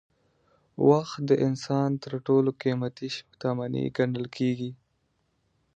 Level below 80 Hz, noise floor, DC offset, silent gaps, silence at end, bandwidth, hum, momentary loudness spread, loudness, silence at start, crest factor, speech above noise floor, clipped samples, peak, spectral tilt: -68 dBFS; -73 dBFS; under 0.1%; none; 1 s; 8.2 kHz; none; 11 LU; -27 LUFS; 0.8 s; 20 dB; 47 dB; under 0.1%; -6 dBFS; -7.5 dB/octave